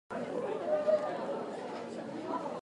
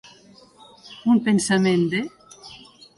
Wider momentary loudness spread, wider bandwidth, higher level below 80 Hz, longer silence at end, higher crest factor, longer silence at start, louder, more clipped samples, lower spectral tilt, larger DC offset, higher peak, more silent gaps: second, 11 LU vs 23 LU; about the same, 11 kHz vs 11.5 kHz; second, -78 dBFS vs -62 dBFS; second, 0 s vs 0.4 s; about the same, 16 dB vs 16 dB; second, 0.1 s vs 0.85 s; second, -35 LUFS vs -20 LUFS; neither; about the same, -6 dB/octave vs -5 dB/octave; neither; second, -18 dBFS vs -8 dBFS; neither